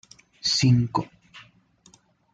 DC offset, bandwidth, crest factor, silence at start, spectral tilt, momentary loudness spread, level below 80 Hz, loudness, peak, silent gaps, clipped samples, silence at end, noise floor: under 0.1%; 9.2 kHz; 18 dB; 0.45 s; -4.5 dB/octave; 12 LU; -56 dBFS; -23 LUFS; -8 dBFS; none; under 0.1%; 0.95 s; -58 dBFS